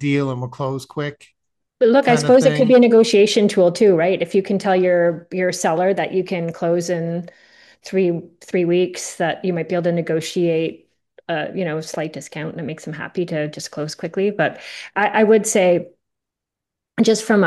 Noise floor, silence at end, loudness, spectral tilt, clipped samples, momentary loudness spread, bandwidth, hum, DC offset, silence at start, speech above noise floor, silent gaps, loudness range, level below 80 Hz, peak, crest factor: -84 dBFS; 0 s; -18 LUFS; -5 dB/octave; under 0.1%; 14 LU; 12.5 kHz; none; under 0.1%; 0 s; 66 dB; none; 10 LU; -64 dBFS; -2 dBFS; 16 dB